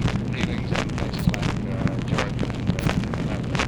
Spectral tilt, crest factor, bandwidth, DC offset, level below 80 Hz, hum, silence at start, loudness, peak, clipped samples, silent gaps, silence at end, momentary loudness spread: -6 dB/octave; 22 dB; over 20 kHz; under 0.1%; -34 dBFS; none; 0 s; -25 LUFS; -2 dBFS; under 0.1%; none; 0 s; 3 LU